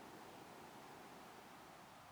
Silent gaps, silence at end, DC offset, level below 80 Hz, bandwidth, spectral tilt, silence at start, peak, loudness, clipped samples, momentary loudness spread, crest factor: none; 0 s; under 0.1%; -82 dBFS; over 20 kHz; -3.5 dB/octave; 0 s; -46 dBFS; -58 LUFS; under 0.1%; 2 LU; 12 dB